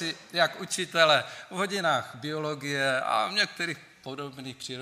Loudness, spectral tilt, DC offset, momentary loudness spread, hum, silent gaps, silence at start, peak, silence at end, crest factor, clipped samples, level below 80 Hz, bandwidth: -27 LUFS; -3 dB/octave; under 0.1%; 16 LU; none; none; 0 s; -6 dBFS; 0 s; 24 dB; under 0.1%; -76 dBFS; 15.5 kHz